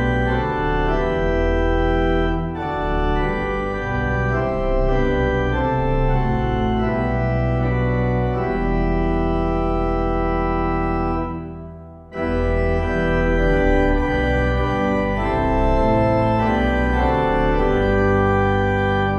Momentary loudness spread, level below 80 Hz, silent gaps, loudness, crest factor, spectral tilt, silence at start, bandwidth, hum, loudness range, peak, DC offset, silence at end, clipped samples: 5 LU; -24 dBFS; none; -20 LUFS; 14 dB; -8.5 dB/octave; 0 s; 6.6 kHz; none; 4 LU; -4 dBFS; under 0.1%; 0 s; under 0.1%